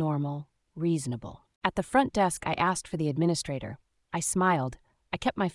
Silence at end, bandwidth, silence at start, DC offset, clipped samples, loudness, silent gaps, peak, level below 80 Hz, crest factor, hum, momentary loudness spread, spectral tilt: 0 s; 12 kHz; 0 s; under 0.1%; under 0.1%; -29 LUFS; 1.56-1.61 s; -8 dBFS; -56 dBFS; 20 dB; none; 13 LU; -5 dB/octave